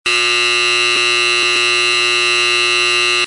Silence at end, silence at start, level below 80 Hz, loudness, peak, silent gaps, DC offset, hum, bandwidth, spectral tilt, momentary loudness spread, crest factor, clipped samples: 0 s; 0.05 s; -62 dBFS; -11 LUFS; -2 dBFS; none; under 0.1%; none; 11.5 kHz; 0 dB/octave; 0 LU; 12 dB; under 0.1%